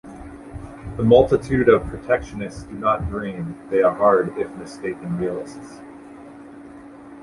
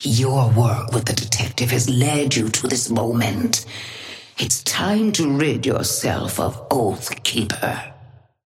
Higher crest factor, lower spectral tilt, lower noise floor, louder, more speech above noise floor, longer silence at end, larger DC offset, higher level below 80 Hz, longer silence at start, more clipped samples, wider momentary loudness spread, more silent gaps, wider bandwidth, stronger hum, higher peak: about the same, 20 dB vs 16 dB; first, -7.5 dB/octave vs -4 dB/octave; second, -41 dBFS vs -47 dBFS; about the same, -20 LUFS vs -20 LUFS; second, 21 dB vs 27 dB; second, 0 s vs 0.4 s; neither; first, -42 dBFS vs -50 dBFS; about the same, 0.05 s vs 0 s; neither; first, 25 LU vs 8 LU; neither; second, 11.5 kHz vs 16.5 kHz; neither; about the same, -2 dBFS vs -4 dBFS